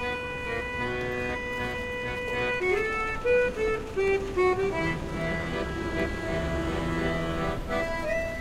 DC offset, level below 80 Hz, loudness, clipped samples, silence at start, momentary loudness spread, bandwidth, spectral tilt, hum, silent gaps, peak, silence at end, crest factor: under 0.1%; -40 dBFS; -28 LUFS; under 0.1%; 0 s; 6 LU; 15.5 kHz; -6 dB/octave; none; none; -14 dBFS; 0 s; 14 dB